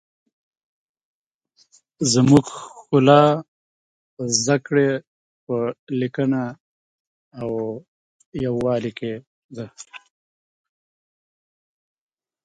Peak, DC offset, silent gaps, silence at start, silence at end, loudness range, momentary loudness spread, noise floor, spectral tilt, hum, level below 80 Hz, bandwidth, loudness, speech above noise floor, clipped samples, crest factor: 0 dBFS; under 0.1%; 3.48-4.17 s, 5.07-5.47 s, 5.79-5.87 s, 6.60-7.31 s, 7.88-8.19 s, 8.26-8.32 s, 9.27-9.49 s; 2 s; 2.45 s; 11 LU; 22 LU; -62 dBFS; -5 dB/octave; none; -58 dBFS; 11 kHz; -20 LUFS; 43 dB; under 0.1%; 22 dB